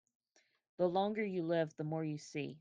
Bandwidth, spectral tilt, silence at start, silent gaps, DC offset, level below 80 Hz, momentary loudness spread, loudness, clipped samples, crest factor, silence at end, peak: 9.4 kHz; -6.5 dB/octave; 0.8 s; none; under 0.1%; -82 dBFS; 8 LU; -38 LUFS; under 0.1%; 18 dB; 0 s; -22 dBFS